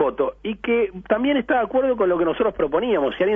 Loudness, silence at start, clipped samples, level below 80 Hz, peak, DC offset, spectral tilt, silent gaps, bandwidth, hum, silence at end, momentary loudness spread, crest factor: -21 LUFS; 0 s; under 0.1%; -48 dBFS; -6 dBFS; under 0.1%; -8.5 dB/octave; none; 3.7 kHz; none; 0 s; 3 LU; 14 dB